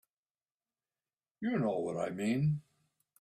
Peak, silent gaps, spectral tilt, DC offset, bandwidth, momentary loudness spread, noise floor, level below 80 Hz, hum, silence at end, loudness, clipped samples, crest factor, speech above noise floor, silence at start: -22 dBFS; none; -7.5 dB/octave; under 0.1%; 12.5 kHz; 7 LU; under -90 dBFS; -72 dBFS; none; 0.6 s; -35 LUFS; under 0.1%; 16 dB; over 57 dB; 1.4 s